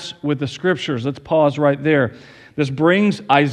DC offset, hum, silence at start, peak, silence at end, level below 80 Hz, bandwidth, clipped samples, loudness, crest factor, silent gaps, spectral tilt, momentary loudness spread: under 0.1%; none; 0 s; 0 dBFS; 0 s; -58 dBFS; 10.5 kHz; under 0.1%; -18 LUFS; 18 dB; none; -6.5 dB/octave; 9 LU